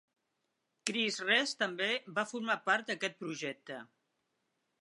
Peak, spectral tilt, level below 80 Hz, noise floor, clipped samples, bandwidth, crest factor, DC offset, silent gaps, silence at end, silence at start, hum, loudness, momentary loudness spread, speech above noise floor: -10 dBFS; -2 dB/octave; under -90 dBFS; -83 dBFS; under 0.1%; 11 kHz; 26 dB; under 0.1%; none; 0.95 s; 0.85 s; none; -33 LUFS; 12 LU; 48 dB